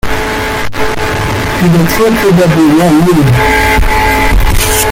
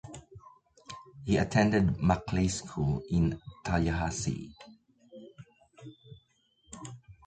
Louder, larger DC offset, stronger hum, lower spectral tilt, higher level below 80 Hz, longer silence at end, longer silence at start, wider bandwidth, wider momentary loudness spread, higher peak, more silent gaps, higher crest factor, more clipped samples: first, -9 LUFS vs -30 LUFS; neither; neither; about the same, -5 dB/octave vs -6 dB/octave; first, -16 dBFS vs -46 dBFS; second, 0 s vs 0.15 s; about the same, 0.05 s vs 0.05 s; first, 17 kHz vs 9.4 kHz; second, 7 LU vs 25 LU; first, 0 dBFS vs -10 dBFS; neither; second, 8 dB vs 22 dB; neither